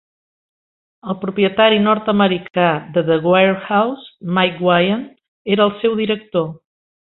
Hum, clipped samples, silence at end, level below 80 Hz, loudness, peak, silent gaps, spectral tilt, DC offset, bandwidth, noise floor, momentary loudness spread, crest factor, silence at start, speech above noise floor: none; under 0.1%; 0.45 s; -58 dBFS; -16 LUFS; -2 dBFS; 5.28-5.45 s; -10.5 dB/octave; under 0.1%; 4.2 kHz; under -90 dBFS; 12 LU; 16 dB; 1.05 s; over 74 dB